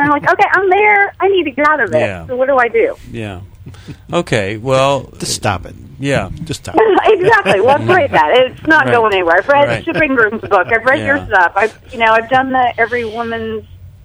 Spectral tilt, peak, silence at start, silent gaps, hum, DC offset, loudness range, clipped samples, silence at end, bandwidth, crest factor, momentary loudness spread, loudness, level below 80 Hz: -5 dB/octave; 0 dBFS; 0 s; none; none; under 0.1%; 6 LU; 0.1%; 0.15 s; over 20 kHz; 12 dB; 10 LU; -12 LUFS; -42 dBFS